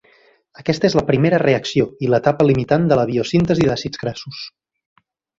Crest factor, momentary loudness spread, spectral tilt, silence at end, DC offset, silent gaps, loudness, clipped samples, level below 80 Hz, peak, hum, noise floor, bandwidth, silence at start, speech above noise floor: 16 dB; 12 LU; -6.5 dB/octave; 0.9 s; under 0.1%; none; -17 LUFS; under 0.1%; -46 dBFS; -2 dBFS; none; -54 dBFS; 7.8 kHz; 0.6 s; 37 dB